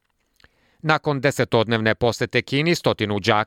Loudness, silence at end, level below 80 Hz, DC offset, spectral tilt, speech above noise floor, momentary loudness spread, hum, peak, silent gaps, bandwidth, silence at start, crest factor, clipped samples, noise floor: -21 LUFS; 0 s; -54 dBFS; under 0.1%; -5.5 dB/octave; 39 dB; 2 LU; none; -4 dBFS; none; 16.5 kHz; 0.85 s; 18 dB; under 0.1%; -59 dBFS